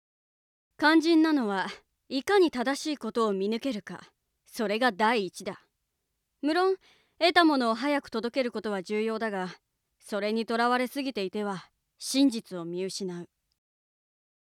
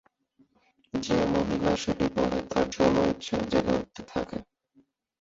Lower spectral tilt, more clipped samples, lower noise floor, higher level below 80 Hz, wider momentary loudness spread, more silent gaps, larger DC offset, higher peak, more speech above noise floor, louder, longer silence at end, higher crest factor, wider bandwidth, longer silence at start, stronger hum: second, -4 dB/octave vs -5.5 dB/octave; neither; first, -81 dBFS vs -67 dBFS; second, -74 dBFS vs -48 dBFS; first, 15 LU vs 11 LU; neither; neither; about the same, -8 dBFS vs -10 dBFS; first, 54 dB vs 40 dB; about the same, -28 LUFS vs -28 LUFS; first, 1.35 s vs 0.8 s; about the same, 20 dB vs 20 dB; first, 15 kHz vs 8 kHz; second, 0.8 s vs 0.95 s; neither